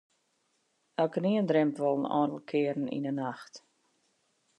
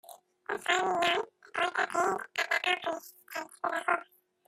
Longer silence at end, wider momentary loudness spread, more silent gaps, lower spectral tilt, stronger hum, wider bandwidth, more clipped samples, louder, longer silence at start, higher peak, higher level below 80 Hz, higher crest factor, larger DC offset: first, 1 s vs 0.45 s; about the same, 12 LU vs 13 LU; neither; first, -7.5 dB/octave vs -1.5 dB/octave; neither; second, 9.8 kHz vs 16 kHz; neither; about the same, -30 LUFS vs -31 LUFS; first, 1 s vs 0.1 s; about the same, -14 dBFS vs -12 dBFS; second, -84 dBFS vs -78 dBFS; about the same, 18 dB vs 22 dB; neither